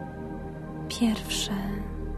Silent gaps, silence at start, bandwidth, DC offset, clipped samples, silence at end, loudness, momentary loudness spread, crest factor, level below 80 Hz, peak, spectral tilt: none; 0 s; 13.5 kHz; under 0.1%; under 0.1%; 0 s; -31 LUFS; 11 LU; 16 dB; -40 dBFS; -14 dBFS; -4.5 dB/octave